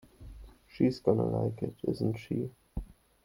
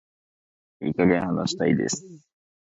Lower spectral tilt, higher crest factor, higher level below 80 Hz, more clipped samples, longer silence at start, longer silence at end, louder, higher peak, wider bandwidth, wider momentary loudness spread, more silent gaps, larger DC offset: first, -9 dB/octave vs -5 dB/octave; about the same, 22 dB vs 20 dB; first, -50 dBFS vs -56 dBFS; neither; second, 0.2 s vs 0.8 s; second, 0.3 s vs 0.55 s; second, -32 LUFS vs -24 LUFS; about the same, -10 dBFS vs -8 dBFS; first, 16.5 kHz vs 8 kHz; first, 20 LU vs 10 LU; neither; neither